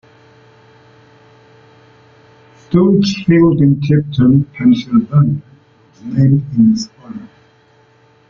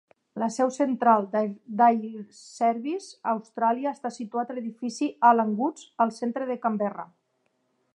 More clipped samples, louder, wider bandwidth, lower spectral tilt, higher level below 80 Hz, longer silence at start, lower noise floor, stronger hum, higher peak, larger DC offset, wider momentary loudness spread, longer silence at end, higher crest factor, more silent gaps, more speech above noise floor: neither; first, -13 LUFS vs -26 LUFS; second, 7.2 kHz vs 11 kHz; first, -8 dB/octave vs -5.5 dB/octave; first, -46 dBFS vs -84 dBFS; first, 2.7 s vs 0.35 s; second, -50 dBFS vs -73 dBFS; neither; first, -2 dBFS vs -6 dBFS; neither; first, 15 LU vs 12 LU; first, 1.05 s vs 0.9 s; second, 14 dB vs 20 dB; neither; second, 38 dB vs 47 dB